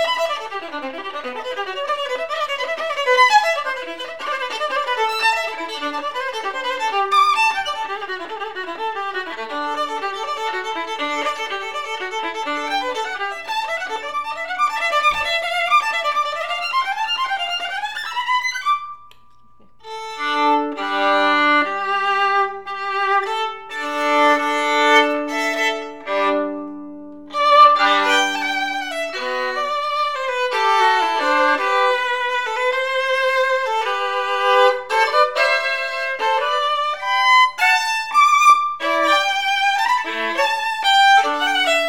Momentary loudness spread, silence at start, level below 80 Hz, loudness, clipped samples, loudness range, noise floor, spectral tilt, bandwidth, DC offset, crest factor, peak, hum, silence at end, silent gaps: 12 LU; 0 s; -60 dBFS; -18 LUFS; under 0.1%; 8 LU; -55 dBFS; -0.5 dB/octave; 19.5 kHz; 0.6%; 18 dB; -2 dBFS; none; 0 s; none